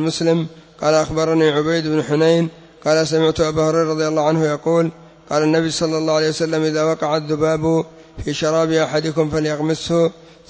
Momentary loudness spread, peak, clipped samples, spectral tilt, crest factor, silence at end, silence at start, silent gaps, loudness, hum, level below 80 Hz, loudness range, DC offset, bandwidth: 6 LU; -4 dBFS; under 0.1%; -5.5 dB/octave; 14 dB; 0.35 s; 0 s; none; -18 LUFS; none; -46 dBFS; 2 LU; under 0.1%; 8 kHz